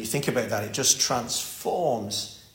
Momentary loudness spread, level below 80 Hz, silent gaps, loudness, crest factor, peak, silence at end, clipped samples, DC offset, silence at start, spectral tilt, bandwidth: 9 LU; -60 dBFS; none; -25 LUFS; 20 dB; -6 dBFS; 0.1 s; under 0.1%; under 0.1%; 0 s; -2.5 dB/octave; 16.5 kHz